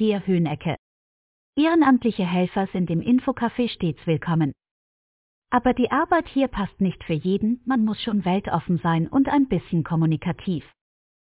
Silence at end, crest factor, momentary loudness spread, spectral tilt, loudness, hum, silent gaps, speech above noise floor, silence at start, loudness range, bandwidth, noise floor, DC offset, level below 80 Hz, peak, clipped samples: 0.6 s; 16 dB; 7 LU; -11.5 dB/octave; -23 LUFS; none; 0.79-1.53 s, 4.71-5.42 s; over 68 dB; 0 s; 2 LU; 4 kHz; under -90 dBFS; under 0.1%; -50 dBFS; -8 dBFS; under 0.1%